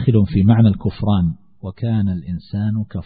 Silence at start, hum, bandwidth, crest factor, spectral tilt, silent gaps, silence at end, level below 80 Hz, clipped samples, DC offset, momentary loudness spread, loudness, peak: 0 s; none; 4.8 kHz; 16 dB; -13.5 dB/octave; none; 0 s; -40 dBFS; under 0.1%; 0.4%; 13 LU; -18 LUFS; 0 dBFS